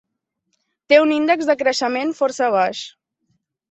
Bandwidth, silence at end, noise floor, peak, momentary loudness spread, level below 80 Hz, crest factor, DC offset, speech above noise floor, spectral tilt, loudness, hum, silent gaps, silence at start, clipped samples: 8.2 kHz; 0.8 s; -74 dBFS; -2 dBFS; 8 LU; -68 dBFS; 18 dB; under 0.1%; 57 dB; -3 dB/octave; -18 LUFS; none; none; 0.9 s; under 0.1%